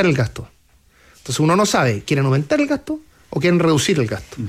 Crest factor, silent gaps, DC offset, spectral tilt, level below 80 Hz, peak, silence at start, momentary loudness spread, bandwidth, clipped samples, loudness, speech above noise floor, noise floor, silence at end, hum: 14 dB; none; under 0.1%; -5.5 dB/octave; -48 dBFS; -4 dBFS; 0 s; 14 LU; 16 kHz; under 0.1%; -18 LUFS; 36 dB; -54 dBFS; 0 s; none